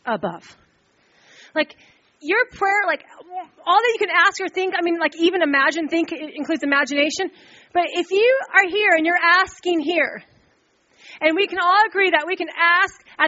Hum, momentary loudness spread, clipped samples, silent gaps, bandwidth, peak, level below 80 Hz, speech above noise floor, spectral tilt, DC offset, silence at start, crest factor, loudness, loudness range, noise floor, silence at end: none; 12 LU; under 0.1%; none; 8 kHz; 0 dBFS; -66 dBFS; 41 dB; 0 dB/octave; under 0.1%; 0.05 s; 20 dB; -19 LUFS; 4 LU; -61 dBFS; 0 s